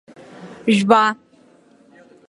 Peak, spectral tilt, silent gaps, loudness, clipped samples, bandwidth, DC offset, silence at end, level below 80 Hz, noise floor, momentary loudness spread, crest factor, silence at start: 0 dBFS; -5.5 dB/octave; none; -16 LUFS; under 0.1%; 11.5 kHz; under 0.1%; 1.15 s; -66 dBFS; -52 dBFS; 22 LU; 20 dB; 0.4 s